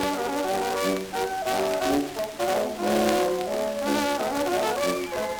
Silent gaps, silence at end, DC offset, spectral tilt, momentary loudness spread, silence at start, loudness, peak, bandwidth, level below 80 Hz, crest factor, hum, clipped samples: none; 0 s; under 0.1%; -3.5 dB/octave; 4 LU; 0 s; -26 LUFS; -6 dBFS; over 20 kHz; -54 dBFS; 20 dB; none; under 0.1%